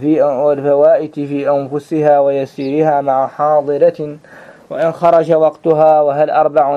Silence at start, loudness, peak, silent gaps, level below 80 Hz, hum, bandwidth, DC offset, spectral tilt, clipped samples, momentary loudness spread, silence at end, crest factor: 0 s; -13 LUFS; 0 dBFS; none; -60 dBFS; none; 7.8 kHz; under 0.1%; -8.5 dB/octave; under 0.1%; 8 LU; 0 s; 12 dB